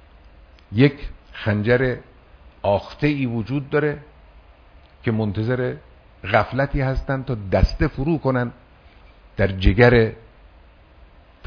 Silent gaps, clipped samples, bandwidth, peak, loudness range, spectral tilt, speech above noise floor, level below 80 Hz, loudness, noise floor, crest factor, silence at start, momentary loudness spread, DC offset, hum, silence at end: none; under 0.1%; 5.4 kHz; 0 dBFS; 4 LU; -8.5 dB/octave; 29 dB; -32 dBFS; -21 LUFS; -49 dBFS; 22 dB; 0.7 s; 11 LU; under 0.1%; none; 0 s